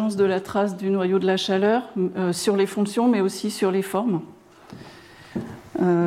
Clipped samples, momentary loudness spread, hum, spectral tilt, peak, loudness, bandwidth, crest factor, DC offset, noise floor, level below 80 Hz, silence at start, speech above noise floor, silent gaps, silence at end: under 0.1%; 13 LU; none; -5.5 dB/octave; -10 dBFS; -23 LUFS; 15.5 kHz; 14 dB; under 0.1%; -45 dBFS; -64 dBFS; 0 s; 23 dB; none; 0 s